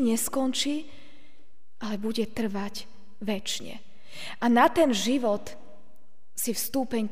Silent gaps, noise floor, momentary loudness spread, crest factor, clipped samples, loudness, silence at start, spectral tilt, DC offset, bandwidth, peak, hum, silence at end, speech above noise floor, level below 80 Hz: none; -66 dBFS; 19 LU; 20 dB; under 0.1%; -27 LUFS; 0 s; -3.5 dB/octave; 2%; 16 kHz; -8 dBFS; none; 0 s; 39 dB; -60 dBFS